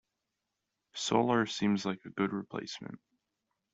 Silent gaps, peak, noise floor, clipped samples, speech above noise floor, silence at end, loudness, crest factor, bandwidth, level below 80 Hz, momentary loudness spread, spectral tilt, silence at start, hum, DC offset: none; -14 dBFS; -86 dBFS; under 0.1%; 54 dB; 0.75 s; -33 LUFS; 22 dB; 8 kHz; -72 dBFS; 17 LU; -5 dB/octave; 0.95 s; none; under 0.1%